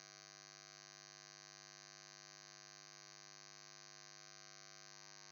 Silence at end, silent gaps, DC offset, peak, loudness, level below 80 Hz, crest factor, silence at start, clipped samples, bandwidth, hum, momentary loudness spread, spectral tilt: 0 s; none; under 0.1%; -40 dBFS; -57 LUFS; under -90 dBFS; 18 dB; 0 s; under 0.1%; 19 kHz; 50 Hz at -75 dBFS; 0 LU; -1 dB/octave